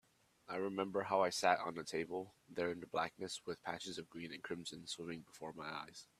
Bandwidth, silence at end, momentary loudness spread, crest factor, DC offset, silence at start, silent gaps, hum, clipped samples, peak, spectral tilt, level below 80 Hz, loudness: 14.5 kHz; 0.15 s; 13 LU; 26 dB; under 0.1%; 0.5 s; none; none; under 0.1%; -16 dBFS; -3.5 dB/octave; -80 dBFS; -42 LUFS